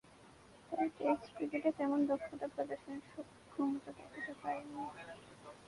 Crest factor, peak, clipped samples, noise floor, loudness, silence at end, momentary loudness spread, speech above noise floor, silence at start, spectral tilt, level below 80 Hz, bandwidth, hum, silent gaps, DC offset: 20 dB; -20 dBFS; under 0.1%; -61 dBFS; -40 LUFS; 0 s; 17 LU; 22 dB; 0.05 s; -6 dB/octave; -74 dBFS; 11.5 kHz; none; none; under 0.1%